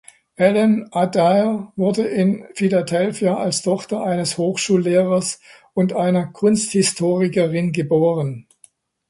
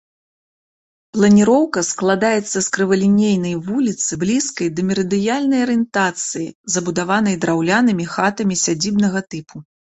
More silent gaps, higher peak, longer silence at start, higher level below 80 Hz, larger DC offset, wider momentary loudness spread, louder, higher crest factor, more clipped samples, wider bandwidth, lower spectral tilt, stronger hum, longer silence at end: second, none vs 6.55-6.64 s; about the same, -2 dBFS vs -2 dBFS; second, 0.4 s vs 1.15 s; about the same, -60 dBFS vs -56 dBFS; neither; about the same, 6 LU vs 7 LU; about the same, -19 LUFS vs -17 LUFS; about the same, 18 dB vs 16 dB; neither; first, 11.5 kHz vs 8.2 kHz; about the same, -5.5 dB/octave vs -4.5 dB/octave; neither; first, 0.7 s vs 0.2 s